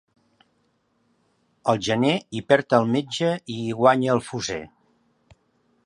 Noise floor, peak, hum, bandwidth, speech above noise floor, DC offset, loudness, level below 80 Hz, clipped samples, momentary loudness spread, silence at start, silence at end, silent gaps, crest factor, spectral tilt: -68 dBFS; -2 dBFS; none; 11.5 kHz; 46 dB; under 0.1%; -22 LUFS; -60 dBFS; under 0.1%; 10 LU; 1.65 s; 1.2 s; none; 22 dB; -5.5 dB/octave